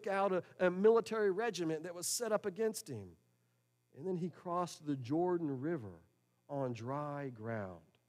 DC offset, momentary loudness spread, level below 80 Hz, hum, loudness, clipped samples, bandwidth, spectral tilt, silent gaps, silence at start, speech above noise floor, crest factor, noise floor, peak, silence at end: under 0.1%; 14 LU; -82 dBFS; none; -37 LUFS; under 0.1%; 15.5 kHz; -5 dB/octave; none; 0 s; 41 dB; 20 dB; -78 dBFS; -18 dBFS; 0.3 s